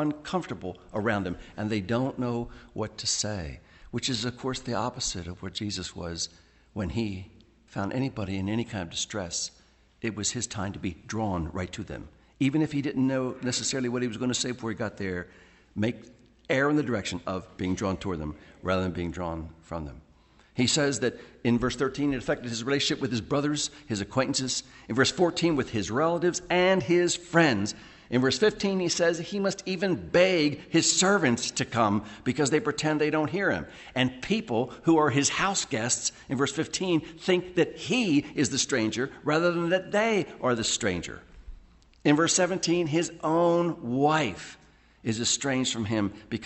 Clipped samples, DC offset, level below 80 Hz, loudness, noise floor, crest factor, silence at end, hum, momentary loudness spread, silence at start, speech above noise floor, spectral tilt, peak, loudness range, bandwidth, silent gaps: under 0.1%; under 0.1%; -54 dBFS; -27 LUFS; -59 dBFS; 20 dB; 0 s; none; 12 LU; 0 s; 32 dB; -4 dB/octave; -8 dBFS; 8 LU; 8.6 kHz; none